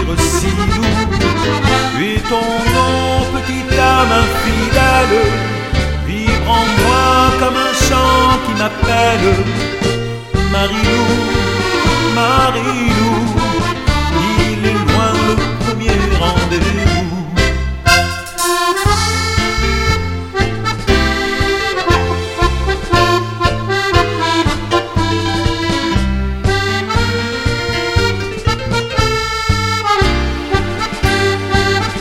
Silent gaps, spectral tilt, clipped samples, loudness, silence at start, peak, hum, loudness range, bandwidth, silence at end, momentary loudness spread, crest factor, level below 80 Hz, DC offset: none; -4.5 dB/octave; under 0.1%; -14 LUFS; 0 s; 0 dBFS; none; 3 LU; 16.5 kHz; 0 s; 6 LU; 14 dB; -22 dBFS; under 0.1%